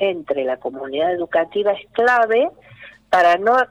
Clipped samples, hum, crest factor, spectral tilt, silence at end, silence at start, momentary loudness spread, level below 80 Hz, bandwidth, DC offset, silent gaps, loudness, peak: under 0.1%; none; 12 dB; -4.5 dB/octave; 0.05 s; 0 s; 10 LU; -60 dBFS; 10.5 kHz; under 0.1%; none; -18 LUFS; -6 dBFS